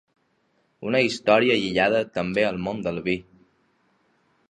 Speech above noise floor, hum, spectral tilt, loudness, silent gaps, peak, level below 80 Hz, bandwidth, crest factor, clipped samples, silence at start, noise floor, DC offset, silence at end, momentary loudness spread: 45 dB; none; -5.5 dB/octave; -23 LUFS; none; -4 dBFS; -58 dBFS; 10.5 kHz; 22 dB; under 0.1%; 0.8 s; -68 dBFS; under 0.1%; 1.3 s; 9 LU